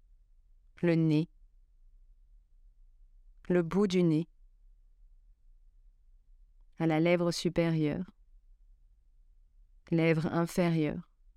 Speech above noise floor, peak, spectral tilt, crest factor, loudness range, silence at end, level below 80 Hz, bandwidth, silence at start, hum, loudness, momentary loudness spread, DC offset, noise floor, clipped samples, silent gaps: 33 dB; -14 dBFS; -7 dB/octave; 20 dB; 3 LU; 0.35 s; -58 dBFS; 13.5 kHz; 0.8 s; none; -30 LUFS; 9 LU; under 0.1%; -62 dBFS; under 0.1%; none